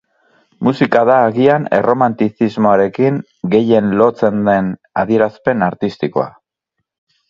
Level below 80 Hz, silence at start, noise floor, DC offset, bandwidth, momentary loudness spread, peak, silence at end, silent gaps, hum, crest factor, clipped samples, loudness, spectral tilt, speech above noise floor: -52 dBFS; 0.6 s; -75 dBFS; under 0.1%; 7.4 kHz; 8 LU; 0 dBFS; 1 s; none; none; 14 dB; under 0.1%; -14 LUFS; -8.5 dB/octave; 61 dB